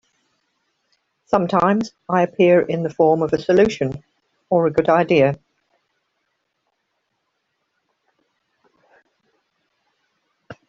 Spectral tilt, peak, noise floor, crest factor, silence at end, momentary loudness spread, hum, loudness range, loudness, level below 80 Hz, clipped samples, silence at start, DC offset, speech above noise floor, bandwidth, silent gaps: -7 dB/octave; -2 dBFS; -73 dBFS; 18 dB; 0.15 s; 8 LU; none; 5 LU; -18 LUFS; -56 dBFS; under 0.1%; 1.3 s; under 0.1%; 56 dB; 7.6 kHz; none